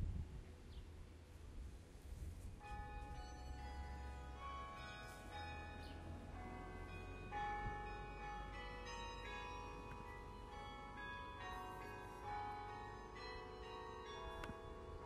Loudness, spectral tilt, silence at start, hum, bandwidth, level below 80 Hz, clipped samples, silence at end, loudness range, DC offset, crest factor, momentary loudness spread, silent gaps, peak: -52 LUFS; -5.5 dB/octave; 0 s; none; 15 kHz; -56 dBFS; under 0.1%; 0 s; 4 LU; under 0.1%; 20 dB; 8 LU; none; -32 dBFS